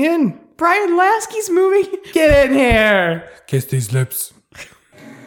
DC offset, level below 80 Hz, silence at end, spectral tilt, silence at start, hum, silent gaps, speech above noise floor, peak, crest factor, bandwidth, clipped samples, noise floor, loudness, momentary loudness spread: under 0.1%; -34 dBFS; 0.1 s; -5 dB/octave; 0 s; none; none; 26 dB; -2 dBFS; 14 dB; 19 kHz; under 0.1%; -41 dBFS; -15 LUFS; 10 LU